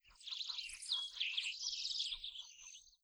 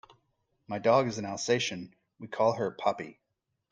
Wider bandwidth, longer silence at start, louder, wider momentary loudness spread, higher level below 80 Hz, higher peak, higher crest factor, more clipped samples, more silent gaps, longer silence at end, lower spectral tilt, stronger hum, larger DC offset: first, over 20 kHz vs 9.8 kHz; second, 0.05 s vs 0.7 s; second, -41 LUFS vs -29 LUFS; second, 13 LU vs 18 LU; about the same, -72 dBFS vs -72 dBFS; second, -26 dBFS vs -10 dBFS; about the same, 18 dB vs 20 dB; neither; neither; second, 0.15 s vs 0.6 s; second, 5 dB/octave vs -4.5 dB/octave; neither; neither